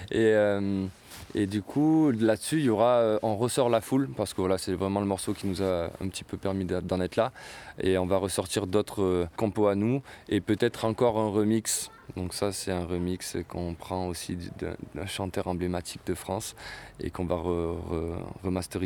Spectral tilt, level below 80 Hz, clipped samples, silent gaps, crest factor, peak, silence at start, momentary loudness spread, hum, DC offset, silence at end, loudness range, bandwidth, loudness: -5.5 dB/octave; -52 dBFS; under 0.1%; none; 18 dB; -10 dBFS; 0 s; 12 LU; none; under 0.1%; 0 s; 8 LU; 20 kHz; -29 LUFS